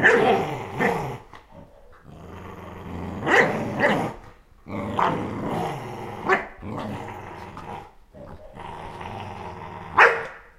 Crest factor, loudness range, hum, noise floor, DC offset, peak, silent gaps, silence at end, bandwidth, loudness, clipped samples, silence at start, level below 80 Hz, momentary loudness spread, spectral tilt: 26 dB; 7 LU; none; -47 dBFS; under 0.1%; 0 dBFS; none; 0.15 s; 15.5 kHz; -23 LUFS; under 0.1%; 0 s; -50 dBFS; 22 LU; -5.5 dB/octave